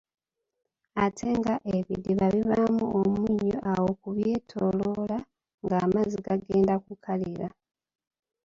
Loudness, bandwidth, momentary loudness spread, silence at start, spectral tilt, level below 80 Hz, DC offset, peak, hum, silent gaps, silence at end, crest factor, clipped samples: -27 LUFS; 7.6 kHz; 8 LU; 0.95 s; -8 dB/octave; -56 dBFS; under 0.1%; -10 dBFS; none; 5.54-5.58 s; 0.95 s; 18 dB; under 0.1%